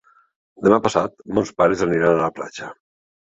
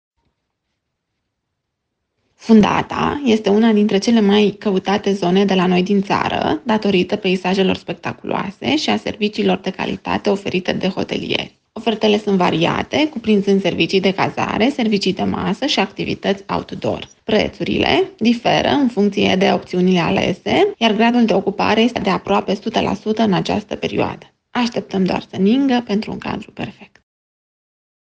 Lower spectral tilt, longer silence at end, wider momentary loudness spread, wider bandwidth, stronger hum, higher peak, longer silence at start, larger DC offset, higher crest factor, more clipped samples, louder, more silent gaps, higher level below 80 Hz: about the same, -6 dB/octave vs -6 dB/octave; second, 0.55 s vs 1.3 s; first, 15 LU vs 9 LU; about the same, 8.2 kHz vs 8.6 kHz; neither; about the same, 0 dBFS vs 0 dBFS; second, 0.6 s vs 2.4 s; neither; about the same, 20 dB vs 16 dB; neither; about the same, -19 LUFS vs -17 LUFS; neither; about the same, -52 dBFS vs -50 dBFS